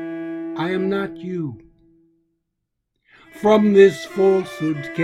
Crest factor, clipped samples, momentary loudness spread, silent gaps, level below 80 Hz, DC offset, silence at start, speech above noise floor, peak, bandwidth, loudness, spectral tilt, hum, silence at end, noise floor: 18 dB; under 0.1%; 15 LU; none; -60 dBFS; under 0.1%; 0 s; 60 dB; -2 dBFS; 12 kHz; -19 LUFS; -7 dB/octave; none; 0 s; -77 dBFS